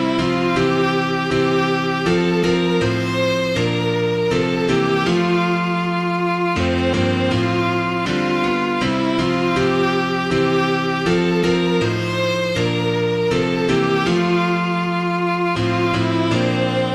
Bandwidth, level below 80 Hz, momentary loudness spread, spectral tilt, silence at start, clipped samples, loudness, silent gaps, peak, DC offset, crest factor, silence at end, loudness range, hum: 12 kHz; -44 dBFS; 2 LU; -6 dB/octave; 0 s; under 0.1%; -18 LUFS; none; -4 dBFS; under 0.1%; 14 dB; 0 s; 1 LU; none